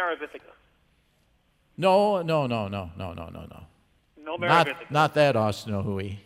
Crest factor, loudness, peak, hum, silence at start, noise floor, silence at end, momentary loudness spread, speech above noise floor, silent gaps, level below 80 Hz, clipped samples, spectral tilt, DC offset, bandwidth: 22 dB; -24 LUFS; -4 dBFS; none; 0 s; -66 dBFS; 0.05 s; 19 LU; 41 dB; none; -58 dBFS; under 0.1%; -6 dB/octave; under 0.1%; 15 kHz